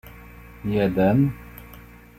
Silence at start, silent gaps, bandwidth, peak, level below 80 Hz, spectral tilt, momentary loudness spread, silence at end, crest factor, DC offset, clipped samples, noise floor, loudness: 0.05 s; none; 16 kHz; -8 dBFS; -46 dBFS; -9 dB/octave; 25 LU; 0.35 s; 16 dB; under 0.1%; under 0.1%; -45 dBFS; -22 LUFS